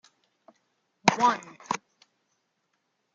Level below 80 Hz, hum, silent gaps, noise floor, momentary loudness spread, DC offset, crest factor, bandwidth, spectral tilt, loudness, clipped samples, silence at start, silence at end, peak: -76 dBFS; none; none; -77 dBFS; 12 LU; under 0.1%; 30 dB; 8.8 kHz; -3.5 dB/octave; -27 LUFS; under 0.1%; 1.05 s; 1.4 s; 0 dBFS